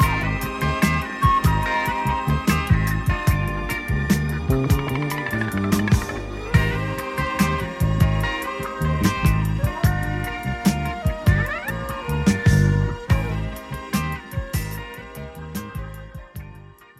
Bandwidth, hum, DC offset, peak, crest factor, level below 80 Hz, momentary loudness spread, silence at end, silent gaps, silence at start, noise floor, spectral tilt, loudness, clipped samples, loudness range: 16 kHz; none; under 0.1%; -2 dBFS; 18 dB; -30 dBFS; 13 LU; 0.35 s; none; 0 s; -43 dBFS; -6 dB/octave; -22 LUFS; under 0.1%; 4 LU